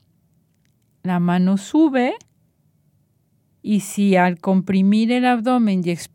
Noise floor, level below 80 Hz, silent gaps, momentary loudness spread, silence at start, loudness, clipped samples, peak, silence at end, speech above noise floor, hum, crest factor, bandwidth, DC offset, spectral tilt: -63 dBFS; -68 dBFS; none; 7 LU; 1.05 s; -18 LUFS; under 0.1%; -2 dBFS; 0.1 s; 46 dB; none; 16 dB; 16.5 kHz; under 0.1%; -6.5 dB/octave